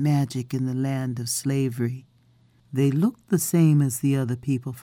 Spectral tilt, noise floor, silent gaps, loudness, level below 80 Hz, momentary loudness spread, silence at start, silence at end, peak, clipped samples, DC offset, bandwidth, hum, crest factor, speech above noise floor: -6.5 dB/octave; -59 dBFS; none; -24 LUFS; -64 dBFS; 8 LU; 0 s; 0 s; -8 dBFS; under 0.1%; under 0.1%; 17.5 kHz; none; 14 dB; 36 dB